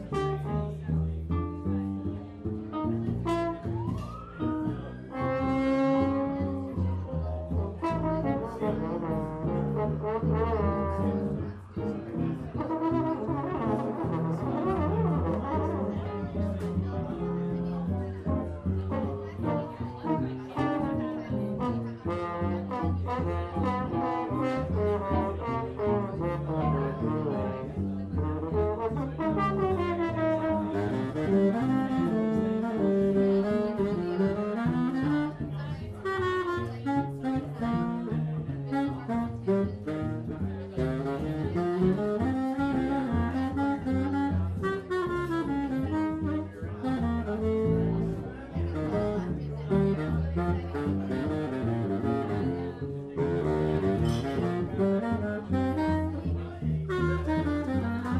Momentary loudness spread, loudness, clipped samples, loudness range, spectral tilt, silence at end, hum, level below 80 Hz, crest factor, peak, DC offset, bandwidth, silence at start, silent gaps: 6 LU; -30 LUFS; under 0.1%; 4 LU; -9 dB/octave; 0 s; none; -44 dBFS; 16 dB; -14 dBFS; under 0.1%; 10.5 kHz; 0 s; none